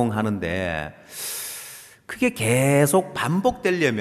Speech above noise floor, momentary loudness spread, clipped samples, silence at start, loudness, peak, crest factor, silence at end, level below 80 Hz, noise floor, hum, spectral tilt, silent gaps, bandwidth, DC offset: 20 dB; 17 LU; under 0.1%; 0 s; -22 LUFS; -6 dBFS; 16 dB; 0 s; -54 dBFS; -42 dBFS; none; -5 dB/octave; none; 14 kHz; under 0.1%